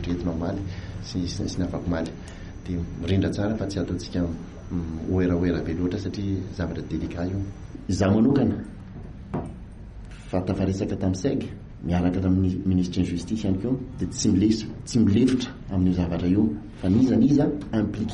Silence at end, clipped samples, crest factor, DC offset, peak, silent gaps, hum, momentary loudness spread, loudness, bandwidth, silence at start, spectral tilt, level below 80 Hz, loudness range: 0 s; under 0.1%; 14 dB; under 0.1%; -10 dBFS; none; none; 15 LU; -25 LUFS; 10.5 kHz; 0 s; -7 dB/octave; -42 dBFS; 6 LU